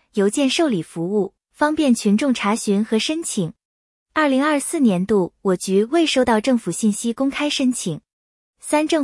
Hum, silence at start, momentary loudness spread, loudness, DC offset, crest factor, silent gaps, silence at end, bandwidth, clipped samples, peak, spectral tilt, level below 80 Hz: none; 0.15 s; 7 LU; -20 LUFS; under 0.1%; 14 dB; 3.65-4.06 s, 8.13-8.53 s; 0 s; 12 kHz; under 0.1%; -6 dBFS; -4.5 dB/octave; -58 dBFS